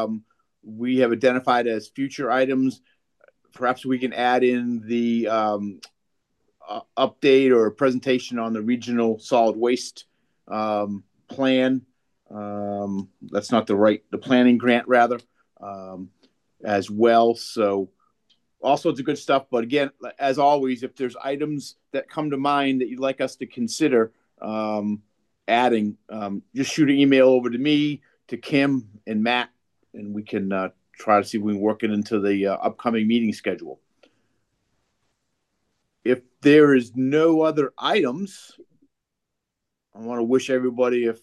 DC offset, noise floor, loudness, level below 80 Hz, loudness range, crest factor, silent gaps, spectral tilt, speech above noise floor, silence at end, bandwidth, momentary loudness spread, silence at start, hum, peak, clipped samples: under 0.1%; -82 dBFS; -22 LUFS; -74 dBFS; 5 LU; 18 dB; none; -5.5 dB/octave; 60 dB; 0.1 s; 12 kHz; 15 LU; 0 s; none; -4 dBFS; under 0.1%